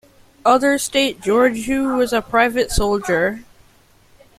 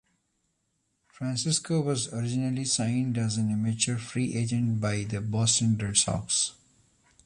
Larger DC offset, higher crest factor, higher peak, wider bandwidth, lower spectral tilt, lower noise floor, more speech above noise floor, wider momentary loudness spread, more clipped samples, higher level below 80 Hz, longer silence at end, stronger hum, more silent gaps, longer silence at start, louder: neither; about the same, 16 dB vs 20 dB; first, -2 dBFS vs -10 dBFS; first, 16 kHz vs 11.5 kHz; about the same, -3.5 dB/octave vs -4 dB/octave; second, -53 dBFS vs -76 dBFS; second, 36 dB vs 48 dB; about the same, 5 LU vs 6 LU; neither; first, -36 dBFS vs -56 dBFS; first, 0.95 s vs 0.75 s; neither; neither; second, 0.45 s vs 1.2 s; first, -18 LUFS vs -27 LUFS